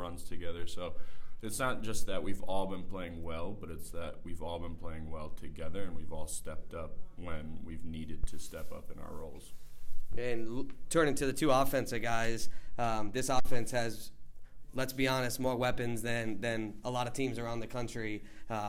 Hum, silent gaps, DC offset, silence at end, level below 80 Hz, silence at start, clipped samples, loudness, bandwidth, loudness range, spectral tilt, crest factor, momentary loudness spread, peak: none; none; under 0.1%; 0 s; -44 dBFS; 0 s; under 0.1%; -37 LUFS; 15.5 kHz; 11 LU; -4.5 dB/octave; 16 dB; 15 LU; -16 dBFS